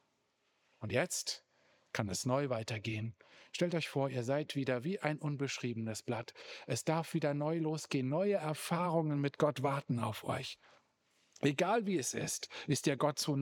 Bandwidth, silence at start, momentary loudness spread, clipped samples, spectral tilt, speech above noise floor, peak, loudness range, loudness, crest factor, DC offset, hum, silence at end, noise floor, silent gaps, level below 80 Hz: over 20 kHz; 0.8 s; 8 LU; under 0.1%; -5 dB/octave; 43 dB; -16 dBFS; 3 LU; -36 LUFS; 20 dB; under 0.1%; none; 0 s; -79 dBFS; none; -80 dBFS